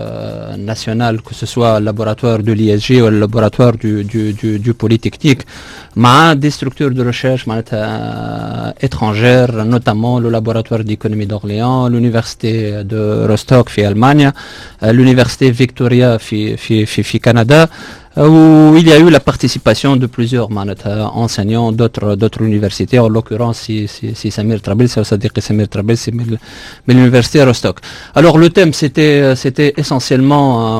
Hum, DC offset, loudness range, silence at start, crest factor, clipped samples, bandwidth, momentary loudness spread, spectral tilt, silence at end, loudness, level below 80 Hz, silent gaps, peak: none; under 0.1%; 6 LU; 0 s; 10 dB; 0.4%; 14 kHz; 12 LU; -6.5 dB/octave; 0 s; -11 LUFS; -38 dBFS; none; 0 dBFS